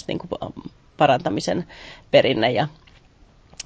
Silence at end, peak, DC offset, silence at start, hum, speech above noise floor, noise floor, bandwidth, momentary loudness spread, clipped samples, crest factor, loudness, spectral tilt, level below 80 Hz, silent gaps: 0.05 s; -2 dBFS; under 0.1%; 0.1 s; none; 32 dB; -52 dBFS; 8 kHz; 19 LU; under 0.1%; 20 dB; -21 LUFS; -5 dB/octave; -52 dBFS; none